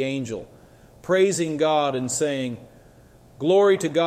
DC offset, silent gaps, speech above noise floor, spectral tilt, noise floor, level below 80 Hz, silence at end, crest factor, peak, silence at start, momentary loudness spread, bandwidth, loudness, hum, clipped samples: under 0.1%; none; 29 dB; -4.5 dB/octave; -51 dBFS; -60 dBFS; 0 s; 16 dB; -8 dBFS; 0 s; 15 LU; 15 kHz; -22 LUFS; none; under 0.1%